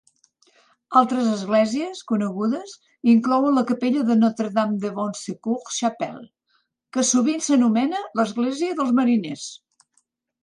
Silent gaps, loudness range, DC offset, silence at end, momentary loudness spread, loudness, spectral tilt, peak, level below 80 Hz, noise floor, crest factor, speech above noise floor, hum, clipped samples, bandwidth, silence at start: none; 3 LU; under 0.1%; 0.9 s; 12 LU; -22 LUFS; -4.5 dB/octave; -4 dBFS; -72 dBFS; -69 dBFS; 18 dB; 48 dB; none; under 0.1%; 11 kHz; 0.9 s